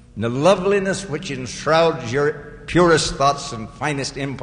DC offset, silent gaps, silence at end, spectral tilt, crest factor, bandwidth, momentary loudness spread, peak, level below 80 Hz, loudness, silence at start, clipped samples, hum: under 0.1%; none; 0 s; -4.5 dB/octave; 16 dB; 10.5 kHz; 11 LU; -4 dBFS; -42 dBFS; -19 LUFS; 0.15 s; under 0.1%; none